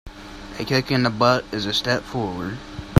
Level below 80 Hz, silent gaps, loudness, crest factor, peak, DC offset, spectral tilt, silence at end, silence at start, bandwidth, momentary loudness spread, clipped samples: -44 dBFS; none; -22 LUFS; 22 dB; 0 dBFS; under 0.1%; -5.5 dB/octave; 0 s; 0.05 s; 15.5 kHz; 17 LU; under 0.1%